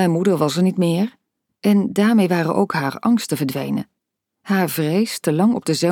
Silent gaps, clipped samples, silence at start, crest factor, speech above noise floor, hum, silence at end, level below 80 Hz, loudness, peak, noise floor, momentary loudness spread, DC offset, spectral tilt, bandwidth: none; under 0.1%; 0 s; 16 dB; 61 dB; none; 0 s; -66 dBFS; -19 LUFS; -4 dBFS; -79 dBFS; 7 LU; under 0.1%; -6 dB/octave; 18 kHz